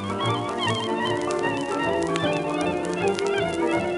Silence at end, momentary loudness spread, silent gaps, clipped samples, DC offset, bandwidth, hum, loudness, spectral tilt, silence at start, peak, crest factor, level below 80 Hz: 0 s; 2 LU; none; under 0.1%; under 0.1%; 11.5 kHz; none; -25 LUFS; -5 dB/octave; 0 s; -6 dBFS; 18 dB; -54 dBFS